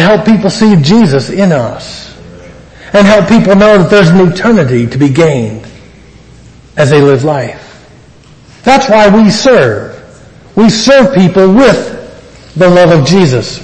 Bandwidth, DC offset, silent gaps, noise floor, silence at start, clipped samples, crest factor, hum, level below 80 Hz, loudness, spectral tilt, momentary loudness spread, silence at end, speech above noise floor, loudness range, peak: 9.6 kHz; under 0.1%; none; -37 dBFS; 0 s; 2%; 8 dB; none; -36 dBFS; -6 LUFS; -6 dB/octave; 15 LU; 0 s; 31 dB; 5 LU; 0 dBFS